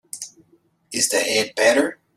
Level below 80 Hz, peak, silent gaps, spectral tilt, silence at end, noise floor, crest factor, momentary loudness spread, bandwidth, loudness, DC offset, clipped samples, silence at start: -68 dBFS; -2 dBFS; none; -1 dB/octave; 0.25 s; -60 dBFS; 20 dB; 17 LU; 15.5 kHz; -19 LUFS; under 0.1%; under 0.1%; 0.15 s